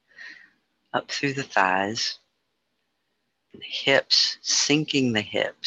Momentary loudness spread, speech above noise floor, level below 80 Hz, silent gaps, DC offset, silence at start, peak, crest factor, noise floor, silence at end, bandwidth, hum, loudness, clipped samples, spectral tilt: 21 LU; 52 dB; -68 dBFS; none; under 0.1%; 0.2 s; -4 dBFS; 22 dB; -76 dBFS; 0.15 s; 9.2 kHz; none; -23 LUFS; under 0.1%; -2.5 dB/octave